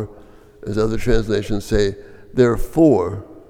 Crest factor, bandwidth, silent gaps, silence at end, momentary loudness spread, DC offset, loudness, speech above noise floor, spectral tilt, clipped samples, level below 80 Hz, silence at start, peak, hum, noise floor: 16 dB; 16 kHz; none; 0.1 s; 13 LU; under 0.1%; -19 LUFS; 27 dB; -7 dB/octave; under 0.1%; -30 dBFS; 0 s; -2 dBFS; none; -44 dBFS